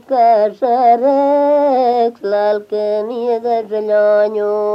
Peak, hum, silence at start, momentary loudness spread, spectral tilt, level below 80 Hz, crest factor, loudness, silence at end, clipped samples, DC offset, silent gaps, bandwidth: -2 dBFS; none; 0.1 s; 7 LU; -6.5 dB/octave; -74 dBFS; 12 dB; -14 LUFS; 0 s; under 0.1%; under 0.1%; none; 5.8 kHz